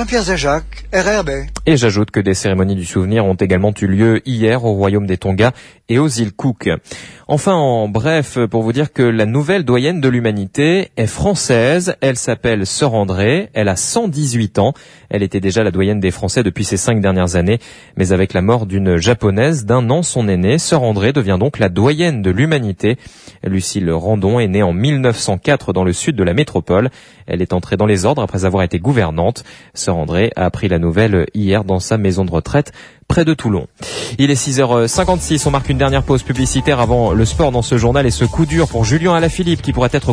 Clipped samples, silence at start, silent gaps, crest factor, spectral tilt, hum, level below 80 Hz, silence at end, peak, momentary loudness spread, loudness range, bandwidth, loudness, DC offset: under 0.1%; 0 s; none; 14 dB; -5.5 dB/octave; none; -32 dBFS; 0 s; 0 dBFS; 5 LU; 2 LU; 11 kHz; -15 LUFS; under 0.1%